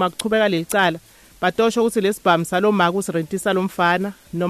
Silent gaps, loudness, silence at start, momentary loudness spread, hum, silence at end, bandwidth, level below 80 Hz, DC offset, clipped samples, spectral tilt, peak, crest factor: none; -19 LUFS; 0 s; 6 LU; none; 0 s; 14 kHz; -56 dBFS; under 0.1%; under 0.1%; -4.5 dB/octave; -4 dBFS; 14 dB